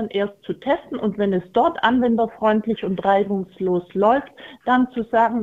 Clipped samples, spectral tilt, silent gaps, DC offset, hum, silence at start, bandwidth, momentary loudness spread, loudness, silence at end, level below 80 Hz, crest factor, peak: under 0.1%; -8 dB/octave; none; under 0.1%; none; 0 s; 7.6 kHz; 7 LU; -21 LUFS; 0 s; -56 dBFS; 18 dB; -2 dBFS